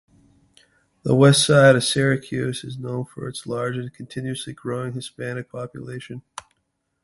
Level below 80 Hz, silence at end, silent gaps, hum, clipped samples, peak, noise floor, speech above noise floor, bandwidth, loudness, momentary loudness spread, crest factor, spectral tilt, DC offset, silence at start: -56 dBFS; 0.85 s; none; none; under 0.1%; -2 dBFS; -74 dBFS; 53 dB; 11.5 kHz; -21 LUFS; 21 LU; 20 dB; -5 dB/octave; under 0.1%; 1.05 s